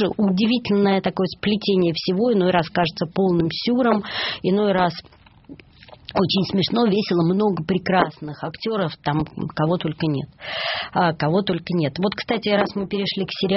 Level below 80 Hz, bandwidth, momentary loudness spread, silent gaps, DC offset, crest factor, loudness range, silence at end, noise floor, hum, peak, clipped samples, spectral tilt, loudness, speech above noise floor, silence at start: -52 dBFS; 6 kHz; 6 LU; none; under 0.1%; 20 dB; 3 LU; 0 s; -46 dBFS; none; -2 dBFS; under 0.1%; -4.5 dB/octave; -21 LUFS; 25 dB; 0 s